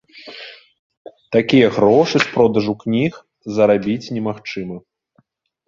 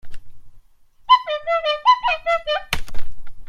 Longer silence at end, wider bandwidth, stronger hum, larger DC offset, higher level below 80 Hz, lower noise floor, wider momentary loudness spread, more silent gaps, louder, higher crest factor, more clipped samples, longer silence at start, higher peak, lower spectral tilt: first, 0.9 s vs 0 s; second, 7.4 kHz vs 16 kHz; neither; neither; second, -54 dBFS vs -36 dBFS; first, -61 dBFS vs -49 dBFS; first, 22 LU vs 11 LU; first, 0.79-0.90 s, 0.97-1.05 s vs none; about the same, -17 LUFS vs -19 LUFS; about the same, 18 dB vs 18 dB; neither; about the same, 0.15 s vs 0.05 s; about the same, 0 dBFS vs 0 dBFS; first, -6.5 dB/octave vs -2 dB/octave